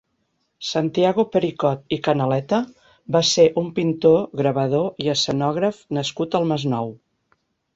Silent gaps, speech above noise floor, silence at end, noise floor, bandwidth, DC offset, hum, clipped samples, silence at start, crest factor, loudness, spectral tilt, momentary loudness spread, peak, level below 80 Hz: none; 51 dB; 0.8 s; -71 dBFS; 8 kHz; under 0.1%; none; under 0.1%; 0.6 s; 18 dB; -20 LUFS; -5.5 dB/octave; 8 LU; -4 dBFS; -58 dBFS